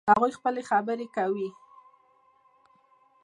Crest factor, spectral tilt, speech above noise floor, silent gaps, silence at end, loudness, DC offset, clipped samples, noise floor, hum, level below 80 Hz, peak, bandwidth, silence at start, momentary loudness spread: 22 dB; -6 dB/octave; 37 dB; none; 1.75 s; -28 LUFS; under 0.1%; under 0.1%; -63 dBFS; none; -72 dBFS; -6 dBFS; 11 kHz; 0.05 s; 10 LU